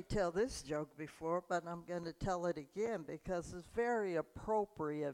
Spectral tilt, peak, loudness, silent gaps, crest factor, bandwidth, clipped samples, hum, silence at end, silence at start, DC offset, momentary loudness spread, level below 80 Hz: -5.5 dB/octave; -24 dBFS; -40 LUFS; none; 16 dB; 16 kHz; under 0.1%; none; 0 s; 0 s; under 0.1%; 8 LU; -58 dBFS